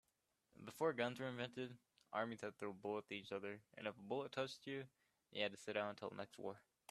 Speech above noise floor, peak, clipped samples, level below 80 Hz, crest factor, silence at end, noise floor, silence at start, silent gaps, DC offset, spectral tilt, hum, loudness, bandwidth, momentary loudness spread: 39 dB; -26 dBFS; under 0.1%; -88 dBFS; 22 dB; 0.3 s; -86 dBFS; 0.6 s; none; under 0.1%; -5 dB/octave; none; -47 LUFS; 13.5 kHz; 10 LU